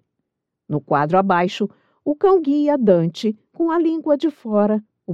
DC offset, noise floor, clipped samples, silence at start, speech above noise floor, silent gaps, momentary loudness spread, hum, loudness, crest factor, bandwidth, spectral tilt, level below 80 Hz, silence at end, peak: under 0.1%; -78 dBFS; under 0.1%; 0.7 s; 60 dB; none; 10 LU; none; -19 LUFS; 16 dB; 8 kHz; -7.5 dB/octave; -62 dBFS; 0 s; -2 dBFS